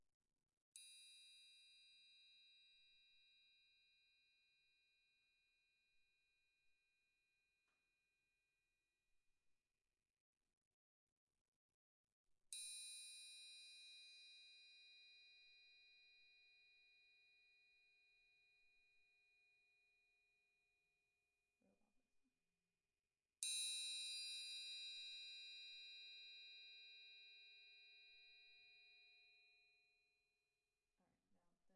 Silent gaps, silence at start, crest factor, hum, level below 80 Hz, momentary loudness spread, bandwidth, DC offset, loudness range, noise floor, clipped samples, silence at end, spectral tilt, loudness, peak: 0.14-0.20 s, 0.53-0.72 s, 10.10-10.14 s, 10.20-10.33 s, 10.57-11.27 s, 11.41-12.04 s, 12.12-12.24 s; 0 s; 34 dB; none; under -90 dBFS; 21 LU; 12 kHz; under 0.1%; 18 LU; under -90 dBFS; under 0.1%; 0 s; 5 dB/octave; -53 LUFS; -28 dBFS